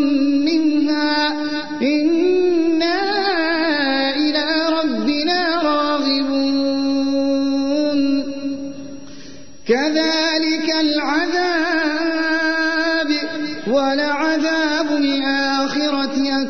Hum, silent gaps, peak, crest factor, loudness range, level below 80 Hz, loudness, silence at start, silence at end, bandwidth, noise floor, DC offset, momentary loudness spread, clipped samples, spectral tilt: none; none; -6 dBFS; 12 dB; 3 LU; -54 dBFS; -18 LUFS; 0 s; 0 s; 6.6 kHz; -40 dBFS; 2%; 5 LU; under 0.1%; -3.5 dB/octave